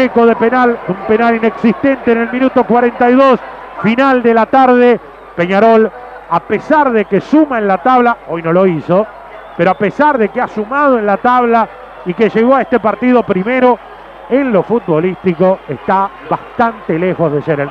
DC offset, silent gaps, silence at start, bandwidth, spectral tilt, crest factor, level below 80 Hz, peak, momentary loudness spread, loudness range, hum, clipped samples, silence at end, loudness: under 0.1%; none; 0 s; 7 kHz; -8.5 dB/octave; 12 dB; -48 dBFS; 0 dBFS; 8 LU; 3 LU; none; under 0.1%; 0 s; -12 LUFS